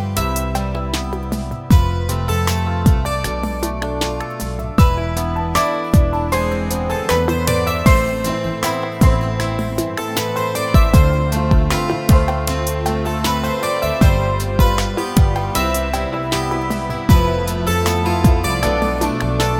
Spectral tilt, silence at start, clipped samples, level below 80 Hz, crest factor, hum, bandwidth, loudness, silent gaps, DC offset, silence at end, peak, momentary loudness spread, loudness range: -5.5 dB/octave; 0 s; under 0.1%; -22 dBFS; 16 dB; none; 19.5 kHz; -18 LUFS; none; under 0.1%; 0 s; 0 dBFS; 7 LU; 2 LU